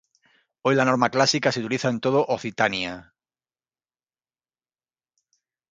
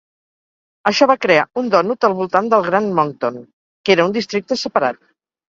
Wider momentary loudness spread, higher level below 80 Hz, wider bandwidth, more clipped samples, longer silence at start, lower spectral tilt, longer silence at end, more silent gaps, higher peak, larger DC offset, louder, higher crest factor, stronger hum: about the same, 9 LU vs 10 LU; about the same, -64 dBFS vs -62 dBFS; first, 9.4 kHz vs 7.6 kHz; neither; second, 0.65 s vs 0.85 s; about the same, -4.5 dB/octave vs -5 dB/octave; first, 2.7 s vs 0.55 s; second, none vs 3.53-3.84 s; second, -4 dBFS vs 0 dBFS; neither; second, -22 LUFS vs -17 LUFS; about the same, 22 dB vs 18 dB; neither